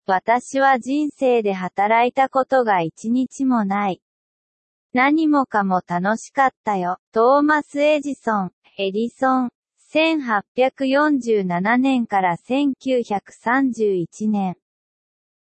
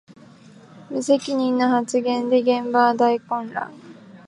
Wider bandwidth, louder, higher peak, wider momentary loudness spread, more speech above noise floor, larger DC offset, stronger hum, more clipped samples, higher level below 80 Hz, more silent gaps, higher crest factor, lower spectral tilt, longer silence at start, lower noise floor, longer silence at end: second, 8.8 kHz vs 11 kHz; about the same, -20 LUFS vs -21 LUFS; about the same, -4 dBFS vs -4 dBFS; second, 7 LU vs 12 LU; first, over 71 dB vs 27 dB; neither; neither; neither; first, -70 dBFS vs -76 dBFS; first, 4.02-4.90 s, 6.57-6.64 s, 6.99-7.12 s, 8.53-8.62 s, 9.55-9.63 s, 10.48-10.55 s vs none; about the same, 14 dB vs 18 dB; first, -6 dB/octave vs -4.5 dB/octave; about the same, 0.1 s vs 0.1 s; first, under -90 dBFS vs -47 dBFS; first, 0.95 s vs 0.1 s